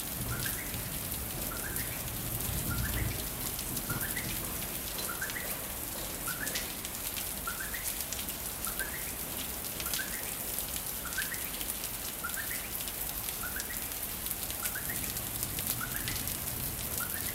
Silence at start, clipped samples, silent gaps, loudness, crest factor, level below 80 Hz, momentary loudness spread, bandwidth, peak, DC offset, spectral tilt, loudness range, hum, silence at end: 0 s; under 0.1%; none; -34 LUFS; 26 dB; -48 dBFS; 3 LU; 16.5 kHz; -10 dBFS; under 0.1%; -2 dB/octave; 1 LU; none; 0 s